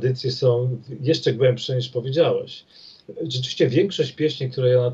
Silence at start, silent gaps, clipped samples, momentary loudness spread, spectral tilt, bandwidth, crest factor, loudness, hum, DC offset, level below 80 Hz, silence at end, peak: 0 s; none; under 0.1%; 9 LU; -6.5 dB/octave; 7.8 kHz; 16 dB; -22 LUFS; none; under 0.1%; -66 dBFS; 0 s; -6 dBFS